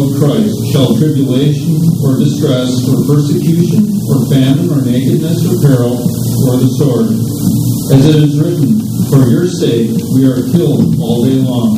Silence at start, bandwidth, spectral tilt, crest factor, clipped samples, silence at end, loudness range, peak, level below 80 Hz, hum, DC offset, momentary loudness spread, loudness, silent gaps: 0 s; 16 kHz; -7 dB/octave; 10 dB; 0.3%; 0 s; 1 LU; 0 dBFS; -40 dBFS; none; under 0.1%; 3 LU; -11 LUFS; none